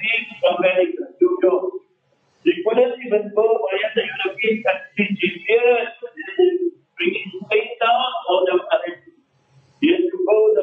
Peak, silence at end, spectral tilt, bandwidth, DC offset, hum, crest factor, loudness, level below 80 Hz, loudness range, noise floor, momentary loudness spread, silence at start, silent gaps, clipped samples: -4 dBFS; 0 s; -7 dB/octave; 4 kHz; under 0.1%; none; 14 dB; -19 LUFS; -76 dBFS; 1 LU; -63 dBFS; 7 LU; 0 s; none; under 0.1%